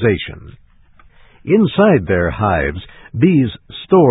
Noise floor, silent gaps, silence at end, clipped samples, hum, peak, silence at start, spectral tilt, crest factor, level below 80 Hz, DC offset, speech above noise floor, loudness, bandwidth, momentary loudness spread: -46 dBFS; none; 0 s; under 0.1%; none; 0 dBFS; 0 s; -13 dB/octave; 16 dB; -34 dBFS; under 0.1%; 32 dB; -15 LUFS; 4 kHz; 17 LU